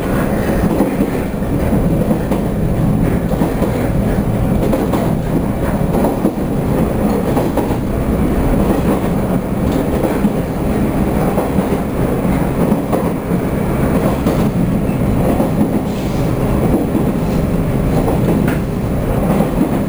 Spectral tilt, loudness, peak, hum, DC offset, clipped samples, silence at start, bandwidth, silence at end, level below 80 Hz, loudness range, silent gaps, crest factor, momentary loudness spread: -8 dB/octave; -16 LUFS; -2 dBFS; none; 0.3%; under 0.1%; 0 s; over 20 kHz; 0 s; -24 dBFS; 1 LU; none; 14 dB; 3 LU